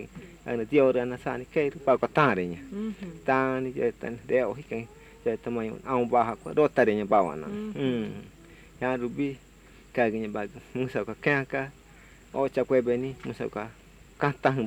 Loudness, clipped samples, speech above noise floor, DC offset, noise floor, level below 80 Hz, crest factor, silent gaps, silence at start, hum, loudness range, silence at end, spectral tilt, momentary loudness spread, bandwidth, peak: -28 LUFS; under 0.1%; 26 dB; under 0.1%; -53 dBFS; -56 dBFS; 20 dB; none; 0 s; none; 4 LU; 0 s; -7 dB/octave; 13 LU; 14 kHz; -8 dBFS